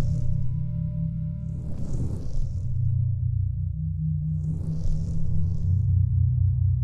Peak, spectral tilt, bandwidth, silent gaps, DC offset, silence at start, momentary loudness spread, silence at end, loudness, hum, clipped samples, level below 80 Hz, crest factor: -12 dBFS; -10.5 dB/octave; 6.8 kHz; none; under 0.1%; 0 s; 8 LU; 0 s; -27 LUFS; none; under 0.1%; -30 dBFS; 12 dB